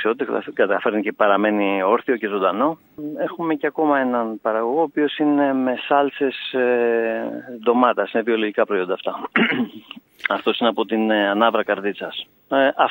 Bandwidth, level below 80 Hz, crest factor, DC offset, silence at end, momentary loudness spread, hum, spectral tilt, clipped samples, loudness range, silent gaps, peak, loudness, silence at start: 16 kHz; -74 dBFS; 18 dB; under 0.1%; 0 s; 9 LU; none; -7.5 dB/octave; under 0.1%; 1 LU; none; -2 dBFS; -20 LUFS; 0 s